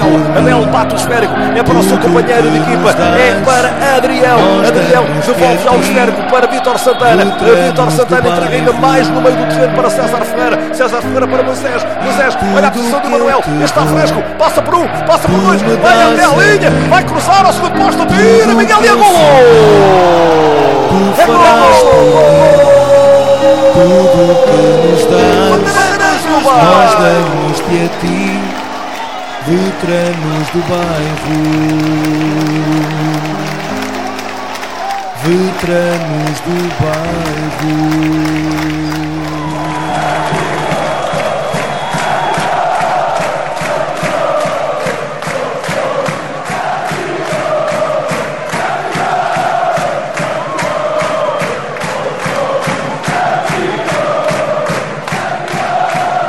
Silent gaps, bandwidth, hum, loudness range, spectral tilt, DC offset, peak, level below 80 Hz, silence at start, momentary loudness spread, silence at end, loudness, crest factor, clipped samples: none; 16.5 kHz; none; 9 LU; -5 dB/octave; 4%; 0 dBFS; -38 dBFS; 0 s; 11 LU; 0 s; -10 LUFS; 10 dB; 0.4%